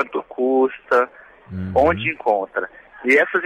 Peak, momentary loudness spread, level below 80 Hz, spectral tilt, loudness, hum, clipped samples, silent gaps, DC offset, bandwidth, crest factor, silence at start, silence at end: -4 dBFS; 11 LU; -48 dBFS; -6.5 dB/octave; -19 LUFS; none; under 0.1%; none; under 0.1%; 11.5 kHz; 16 dB; 0 s; 0 s